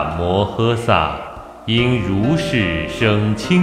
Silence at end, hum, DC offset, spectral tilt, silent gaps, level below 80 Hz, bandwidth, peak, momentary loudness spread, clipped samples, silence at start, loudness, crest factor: 0 s; none; under 0.1%; -6.5 dB/octave; none; -36 dBFS; 13 kHz; 0 dBFS; 6 LU; under 0.1%; 0 s; -17 LUFS; 16 dB